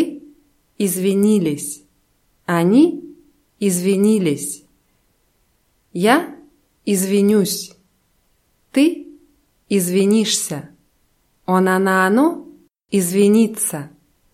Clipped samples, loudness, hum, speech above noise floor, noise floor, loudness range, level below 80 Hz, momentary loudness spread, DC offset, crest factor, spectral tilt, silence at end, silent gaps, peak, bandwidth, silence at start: under 0.1%; -17 LUFS; none; 47 dB; -63 dBFS; 3 LU; -64 dBFS; 18 LU; under 0.1%; 18 dB; -5 dB/octave; 0.45 s; none; 0 dBFS; 16 kHz; 0 s